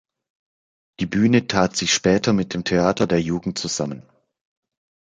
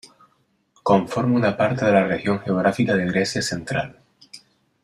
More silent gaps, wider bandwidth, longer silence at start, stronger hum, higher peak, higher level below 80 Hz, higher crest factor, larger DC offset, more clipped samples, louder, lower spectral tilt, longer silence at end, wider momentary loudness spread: neither; second, 9.4 kHz vs 13 kHz; first, 1 s vs 0.05 s; neither; about the same, -2 dBFS vs -4 dBFS; first, -50 dBFS vs -56 dBFS; about the same, 20 dB vs 18 dB; neither; neither; about the same, -20 LUFS vs -21 LUFS; second, -4.5 dB/octave vs -6 dB/octave; first, 1.2 s vs 0.45 s; about the same, 8 LU vs 8 LU